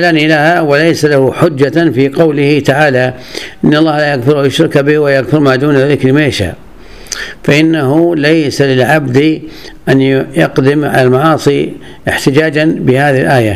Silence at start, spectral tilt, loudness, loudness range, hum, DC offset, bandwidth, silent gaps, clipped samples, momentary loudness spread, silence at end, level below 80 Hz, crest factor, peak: 0 s; -6 dB/octave; -9 LUFS; 1 LU; none; 0.9%; 14.5 kHz; none; 0.7%; 8 LU; 0 s; -40 dBFS; 10 dB; 0 dBFS